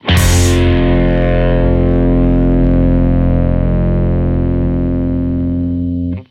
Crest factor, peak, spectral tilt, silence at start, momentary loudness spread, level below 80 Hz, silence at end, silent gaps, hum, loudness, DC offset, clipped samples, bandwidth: 12 dB; 0 dBFS; -6.5 dB/octave; 0.05 s; 5 LU; -16 dBFS; 0.05 s; none; none; -13 LUFS; under 0.1%; under 0.1%; 15.5 kHz